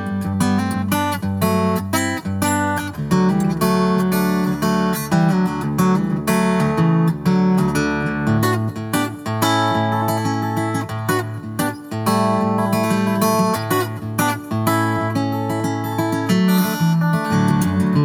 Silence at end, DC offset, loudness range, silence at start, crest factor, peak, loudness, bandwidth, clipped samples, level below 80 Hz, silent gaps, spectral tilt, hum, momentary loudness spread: 0 s; under 0.1%; 2 LU; 0 s; 14 dB; -4 dBFS; -19 LUFS; 19.5 kHz; under 0.1%; -46 dBFS; none; -6 dB/octave; none; 5 LU